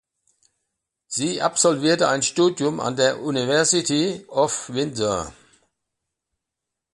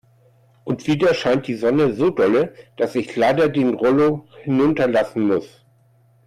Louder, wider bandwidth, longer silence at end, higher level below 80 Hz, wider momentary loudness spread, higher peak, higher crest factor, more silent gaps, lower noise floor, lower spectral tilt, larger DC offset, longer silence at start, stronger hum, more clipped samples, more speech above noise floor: about the same, -21 LUFS vs -19 LUFS; second, 11.5 kHz vs 13 kHz; first, 1.6 s vs 0.8 s; about the same, -58 dBFS vs -56 dBFS; about the same, 8 LU vs 9 LU; first, -4 dBFS vs -8 dBFS; first, 18 dB vs 10 dB; neither; first, -84 dBFS vs -56 dBFS; second, -3 dB/octave vs -7 dB/octave; neither; first, 1.1 s vs 0.65 s; neither; neither; first, 63 dB vs 38 dB